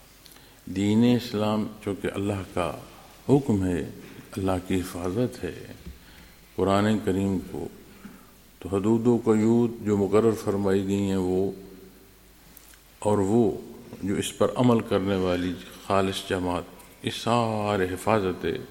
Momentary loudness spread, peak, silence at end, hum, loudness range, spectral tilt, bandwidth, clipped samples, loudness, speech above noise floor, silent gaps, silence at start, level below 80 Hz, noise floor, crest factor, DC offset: 17 LU; -6 dBFS; 0 s; none; 4 LU; -6.5 dB/octave; 17 kHz; under 0.1%; -25 LUFS; 28 dB; none; 0.65 s; -54 dBFS; -53 dBFS; 20 dB; under 0.1%